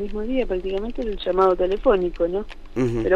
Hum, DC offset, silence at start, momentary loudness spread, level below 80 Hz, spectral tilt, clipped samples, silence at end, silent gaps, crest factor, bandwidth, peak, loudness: none; under 0.1%; 0 s; 9 LU; -34 dBFS; -7.5 dB/octave; under 0.1%; 0 s; none; 16 dB; 7.4 kHz; -6 dBFS; -23 LUFS